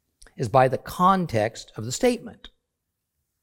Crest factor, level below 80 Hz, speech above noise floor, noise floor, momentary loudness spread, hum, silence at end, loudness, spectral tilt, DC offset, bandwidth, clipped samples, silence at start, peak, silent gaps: 20 dB; -54 dBFS; 58 dB; -81 dBFS; 13 LU; none; 0.95 s; -23 LUFS; -5.5 dB/octave; under 0.1%; 17 kHz; under 0.1%; 0.4 s; -4 dBFS; none